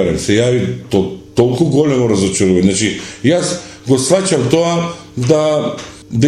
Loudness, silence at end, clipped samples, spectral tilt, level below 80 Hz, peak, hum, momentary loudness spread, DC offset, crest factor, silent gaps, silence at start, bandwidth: -14 LUFS; 0 s; under 0.1%; -5.5 dB/octave; -42 dBFS; 0 dBFS; none; 8 LU; under 0.1%; 14 dB; none; 0 s; 13.5 kHz